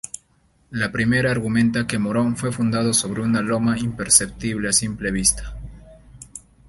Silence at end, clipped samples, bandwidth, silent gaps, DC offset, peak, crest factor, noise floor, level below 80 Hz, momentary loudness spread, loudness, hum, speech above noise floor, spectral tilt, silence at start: 0.3 s; under 0.1%; 12 kHz; none; under 0.1%; 0 dBFS; 22 dB; -60 dBFS; -42 dBFS; 20 LU; -20 LUFS; none; 40 dB; -3.5 dB/octave; 0.7 s